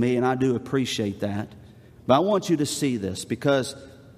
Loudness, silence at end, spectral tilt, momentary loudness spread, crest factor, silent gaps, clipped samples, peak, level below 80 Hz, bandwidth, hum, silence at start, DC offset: -24 LUFS; 0.15 s; -5.5 dB/octave; 12 LU; 20 dB; none; under 0.1%; -4 dBFS; -62 dBFS; 15.5 kHz; none; 0 s; under 0.1%